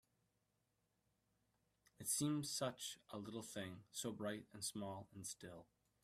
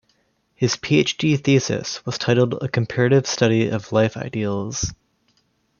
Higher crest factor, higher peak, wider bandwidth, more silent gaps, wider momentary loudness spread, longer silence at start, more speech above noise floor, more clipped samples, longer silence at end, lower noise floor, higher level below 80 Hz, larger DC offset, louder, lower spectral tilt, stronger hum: about the same, 20 dB vs 18 dB; second, -30 dBFS vs -2 dBFS; first, 15.5 kHz vs 7.2 kHz; neither; first, 11 LU vs 8 LU; first, 2 s vs 0.6 s; second, 38 dB vs 46 dB; neither; second, 0.4 s vs 0.85 s; first, -86 dBFS vs -65 dBFS; second, -82 dBFS vs -52 dBFS; neither; second, -46 LUFS vs -20 LUFS; second, -3.5 dB/octave vs -5 dB/octave; neither